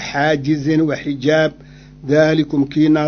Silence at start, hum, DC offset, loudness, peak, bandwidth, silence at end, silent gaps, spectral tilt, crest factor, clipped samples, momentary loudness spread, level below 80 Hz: 0 s; none; under 0.1%; -16 LUFS; 0 dBFS; 6.8 kHz; 0 s; none; -6.5 dB/octave; 16 dB; under 0.1%; 6 LU; -46 dBFS